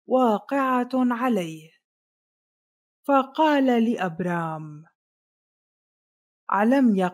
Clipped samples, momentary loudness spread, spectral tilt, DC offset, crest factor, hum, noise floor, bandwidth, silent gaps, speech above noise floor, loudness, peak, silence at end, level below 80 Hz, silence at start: under 0.1%; 16 LU; -7 dB/octave; under 0.1%; 18 dB; none; under -90 dBFS; 15 kHz; 1.84-3.03 s, 4.95-6.47 s; over 68 dB; -23 LUFS; -8 dBFS; 0 s; -80 dBFS; 0.1 s